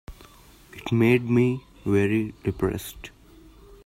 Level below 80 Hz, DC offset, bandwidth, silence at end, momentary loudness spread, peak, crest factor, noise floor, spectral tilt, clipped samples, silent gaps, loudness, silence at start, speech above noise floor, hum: -48 dBFS; under 0.1%; 16 kHz; 0.1 s; 20 LU; -10 dBFS; 16 dB; -51 dBFS; -7.5 dB/octave; under 0.1%; none; -24 LUFS; 0.1 s; 28 dB; none